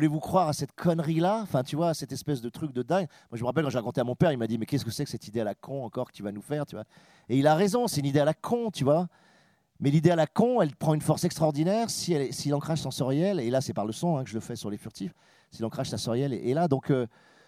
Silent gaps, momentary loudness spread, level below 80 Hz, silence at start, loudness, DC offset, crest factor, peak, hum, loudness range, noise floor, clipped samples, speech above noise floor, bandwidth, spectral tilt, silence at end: none; 11 LU; -62 dBFS; 0 s; -28 LUFS; under 0.1%; 20 dB; -8 dBFS; none; 5 LU; -64 dBFS; under 0.1%; 36 dB; 16 kHz; -6 dB/octave; 0.4 s